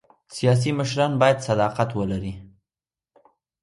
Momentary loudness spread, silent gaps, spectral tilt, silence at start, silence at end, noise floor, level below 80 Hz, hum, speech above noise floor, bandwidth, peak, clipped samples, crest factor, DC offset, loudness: 14 LU; none; -6 dB/octave; 0.3 s; 1.15 s; under -90 dBFS; -50 dBFS; none; over 69 dB; 11.5 kHz; -6 dBFS; under 0.1%; 18 dB; under 0.1%; -22 LUFS